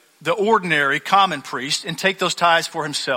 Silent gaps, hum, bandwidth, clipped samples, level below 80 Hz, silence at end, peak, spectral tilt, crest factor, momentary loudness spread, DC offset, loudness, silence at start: none; none; 16.5 kHz; under 0.1%; -64 dBFS; 0 s; -2 dBFS; -3 dB/octave; 18 dB; 7 LU; under 0.1%; -19 LUFS; 0.2 s